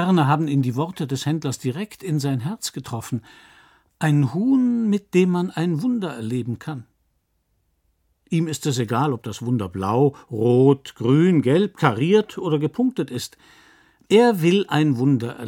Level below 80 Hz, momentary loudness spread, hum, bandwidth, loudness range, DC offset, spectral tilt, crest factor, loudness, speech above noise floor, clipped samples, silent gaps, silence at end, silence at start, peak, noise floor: -64 dBFS; 12 LU; none; 17 kHz; 8 LU; under 0.1%; -6.5 dB/octave; 20 dB; -21 LUFS; 49 dB; under 0.1%; none; 0 s; 0 s; 0 dBFS; -69 dBFS